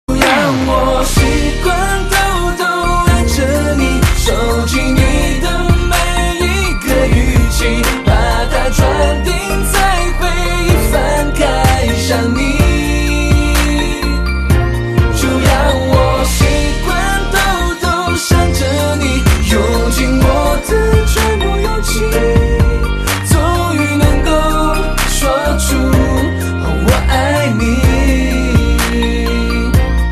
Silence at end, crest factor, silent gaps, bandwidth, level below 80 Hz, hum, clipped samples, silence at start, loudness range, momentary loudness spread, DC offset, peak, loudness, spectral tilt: 0 s; 12 dB; none; 14 kHz; -16 dBFS; none; under 0.1%; 0.1 s; 1 LU; 3 LU; under 0.1%; 0 dBFS; -13 LUFS; -5 dB/octave